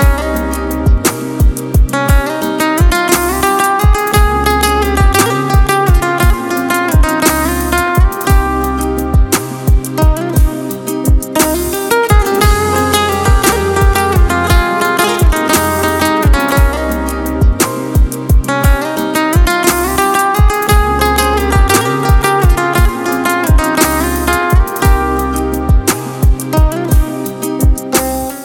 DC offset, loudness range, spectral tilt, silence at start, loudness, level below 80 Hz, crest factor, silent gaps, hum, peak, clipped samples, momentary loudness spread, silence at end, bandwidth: under 0.1%; 2 LU; -5 dB/octave; 0 s; -12 LUFS; -14 dBFS; 10 dB; none; none; 0 dBFS; under 0.1%; 4 LU; 0 s; 18 kHz